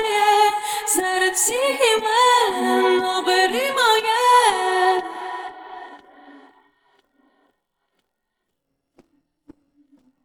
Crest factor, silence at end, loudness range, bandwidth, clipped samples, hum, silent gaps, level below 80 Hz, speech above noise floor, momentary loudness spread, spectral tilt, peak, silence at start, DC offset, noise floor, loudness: 18 dB; 3.95 s; 11 LU; 19.5 kHz; under 0.1%; none; none; -64 dBFS; 60 dB; 15 LU; 0 dB/octave; -4 dBFS; 0 s; under 0.1%; -77 dBFS; -18 LUFS